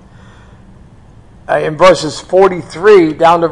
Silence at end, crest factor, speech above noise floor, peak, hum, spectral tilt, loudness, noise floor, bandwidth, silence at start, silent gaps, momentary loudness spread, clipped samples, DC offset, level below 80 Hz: 0 s; 12 dB; 30 dB; 0 dBFS; none; -5 dB/octave; -10 LUFS; -39 dBFS; 11 kHz; 1.5 s; none; 8 LU; 0.4%; under 0.1%; -42 dBFS